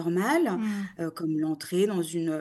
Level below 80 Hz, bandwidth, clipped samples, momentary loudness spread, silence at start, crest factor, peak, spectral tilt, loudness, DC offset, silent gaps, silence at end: -74 dBFS; 12.5 kHz; under 0.1%; 8 LU; 0 s; 14 dB; -14 dBFS; -6 dB/octave; -28 LUFS; under 0.1%; none; 0 s